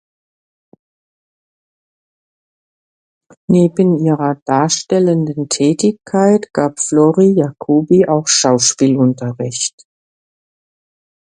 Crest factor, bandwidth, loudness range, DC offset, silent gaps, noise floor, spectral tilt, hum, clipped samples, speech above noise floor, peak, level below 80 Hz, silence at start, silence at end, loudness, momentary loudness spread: 16 dB; 11 kHz; 6 LU; under 0.1%; 4.42-4.46 s; under -90 dBFS; -5 dB/octave; none; under 0.1%; over 77 dB; 0 dBFS; -58 dBFS; 3.5 s; 1.55 s; -14 LUFS; 7 LU